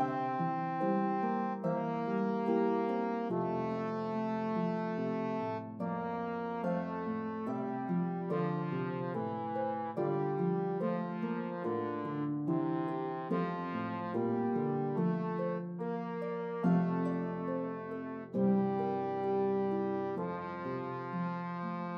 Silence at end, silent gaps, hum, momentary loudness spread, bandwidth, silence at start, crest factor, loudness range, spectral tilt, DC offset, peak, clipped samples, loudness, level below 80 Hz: 0 s; none; none; 6 LU; 6 kHz; 0 s; 16 dB; 3 LU; -10 dB/octave; under 0.1%; -20 dBFS; under 0.1%; -35 LUFS; -80 dBFS